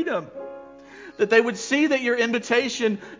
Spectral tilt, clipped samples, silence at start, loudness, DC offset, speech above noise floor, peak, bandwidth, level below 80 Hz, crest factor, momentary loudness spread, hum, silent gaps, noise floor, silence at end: -3.5 dB/octave; under 0.1%; 0 s; -22 LUFS; under 0.1%; 21 dB; -4 dBFS; 7.6 kHz; -68 dBFS; 18 dB; 21 LU; none; none; -44 dBFS; 0.05 s